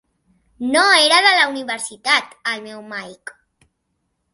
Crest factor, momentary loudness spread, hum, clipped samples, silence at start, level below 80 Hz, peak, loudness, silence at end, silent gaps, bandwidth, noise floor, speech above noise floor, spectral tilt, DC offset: 20 dB; 19 LU; none; under 0.1%; 0.6 s; -66 dBFS; 0 dBFS; -15 LUFS; 1.2 s; none; 12 kHz; -72 dBFS; 54 dB; 0 dB/octave; under 0.1%